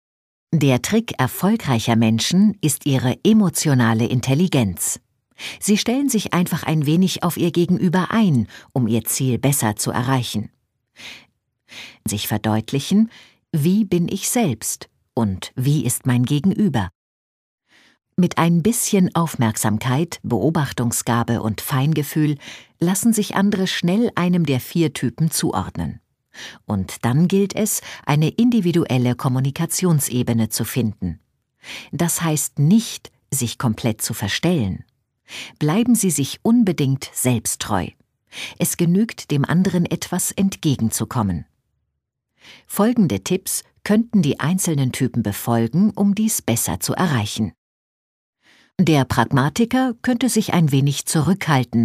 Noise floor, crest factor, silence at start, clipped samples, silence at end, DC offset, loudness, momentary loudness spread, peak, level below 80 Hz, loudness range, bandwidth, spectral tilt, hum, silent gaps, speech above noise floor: -76 dBFS; 18 dB; 0.5 s; under 0.1%; 0 s; under 0.1%; -19 LUFS; 10 LU; -2 dBFS; -52 dBFS; 4 LU; 15.5 kHz; -5 dB/octave; none; 16.95-17.58 s, 47.58-48.33 s; 58 dB